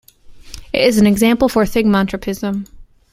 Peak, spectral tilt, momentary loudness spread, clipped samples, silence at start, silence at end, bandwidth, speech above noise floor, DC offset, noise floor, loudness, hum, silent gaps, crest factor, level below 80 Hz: 0 dBFS; -5.5 dB/octave; 10 LU; under 0.1%; 0.3 s; 0.3 s; 16 kHz; 24 dB; under 0.1%; -38 dBFS; -15 LUFS; none; none; 16 dB; -38 dBFS